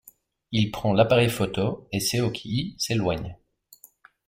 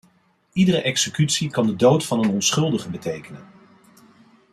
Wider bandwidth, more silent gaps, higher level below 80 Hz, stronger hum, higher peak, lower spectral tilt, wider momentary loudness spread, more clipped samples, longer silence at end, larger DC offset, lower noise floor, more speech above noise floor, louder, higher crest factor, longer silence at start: first, 16.5 kHz vs 14 kHz; neither; first, -52 dBFS vs -60 dBFS; neither; about the same, -6 dBFS vs -4 dBFS; about the same, -5 dB/octave vs -4.5 dB/octave; about the same, 10 LU vs 12 LU; neither; second, 0.95 s vs 1.1 s; neither; second, -55 dBFS vs -61 dBFS; second, 31 dB vs 41 dB; second, -25 LUFS vs -20 LUFS; about the same, 20 dB vs 18 dB; about the same, 0.5 s vs 0.55 s